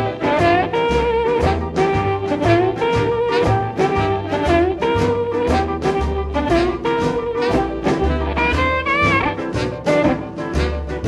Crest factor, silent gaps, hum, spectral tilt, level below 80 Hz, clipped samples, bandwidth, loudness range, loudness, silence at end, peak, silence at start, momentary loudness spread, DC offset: 14 dB; none; none; -6.5 dB/octave; -30 dBFS; under 0.1%; 12 kHz; 1 LU; -18 LUFS; 0 s; -4 dBFS; 0 s; 5 LU; under 0.1%